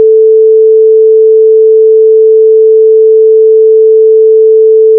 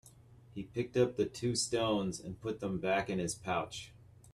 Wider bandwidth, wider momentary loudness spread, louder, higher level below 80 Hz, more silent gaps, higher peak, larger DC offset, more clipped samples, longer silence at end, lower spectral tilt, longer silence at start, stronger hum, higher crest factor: second, 0.5 kHz vs 13 kHz; second, 0 LU vs 13 LU; first, -4 LUFS vs -35 LUFS; second, under -90 dBFS vs -62 dBFS; neither; first, 0 dBFS vs -16 dBFS; neither; first, 0.6% vs under 0.1%; about the same, 0 s vs 0.05 s; first, -11 dB/octave vs -4.5 dB/octave; about the same, 0 s vs 0.05 s; neither; second, 4 dB vs 20 dB